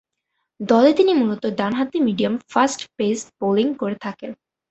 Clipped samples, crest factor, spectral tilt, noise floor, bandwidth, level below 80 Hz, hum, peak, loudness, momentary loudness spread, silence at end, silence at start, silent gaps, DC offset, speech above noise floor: under 0.1%; 18 dB; -5 dB/octave; -76 dBFS; 8.2 kHz; -62 dBFS; none; -2 dBFS; -20 LUFS; 14 LU; 0.35 s; 0.6 s; none; under 0.1%; 57 dB